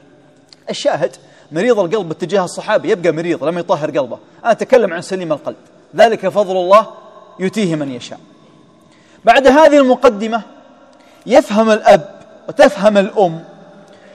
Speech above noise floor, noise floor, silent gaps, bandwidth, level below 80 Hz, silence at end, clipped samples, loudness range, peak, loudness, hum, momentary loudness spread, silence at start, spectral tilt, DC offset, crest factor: 34 dB; -47 dBFS; none; 12.5 kHz; -52 dBFS; 0.7 s; 0.7%; 5 LU; 0 dBFS; -13 LUFS; none; 16 LU; 0.65 s; -5 dB/octave; under 0.1%; 14 dB